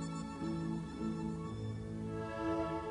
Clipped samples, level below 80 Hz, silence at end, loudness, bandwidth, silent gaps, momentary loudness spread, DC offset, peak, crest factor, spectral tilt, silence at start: under 0.1%; -56 dBFS; 0 s; -40 LUFS; 11 kHz; none; 5 LU; under 0.1%; -26 dBFS; 14 dB; -7 dB/octave; 0 s